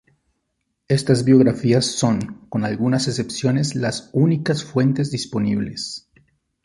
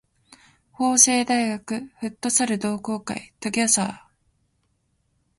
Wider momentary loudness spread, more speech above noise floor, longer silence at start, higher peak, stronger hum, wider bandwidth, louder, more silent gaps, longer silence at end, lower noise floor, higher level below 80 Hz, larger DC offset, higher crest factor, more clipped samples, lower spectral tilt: second, 10 LU vs 15 LU; first, 55 dB vs 47 dB; about the same, 0.9 s vs 0.8 s; about the same, -2 dBFS vs 0 dBFS; neither; about the same, 11.5 kHz vs 11.5 kHz; about the same, -20 LUFS vs -21 LUFS; neither; second, 0.65 s vs 1.4 s; first, -74 dBFS vs -69 dBFS; first, -54 dBFS vs -64 dBFS; neither; second, 18 dB vs 24 dB; neither; first, -6 dB/octave vs -2 dB/octave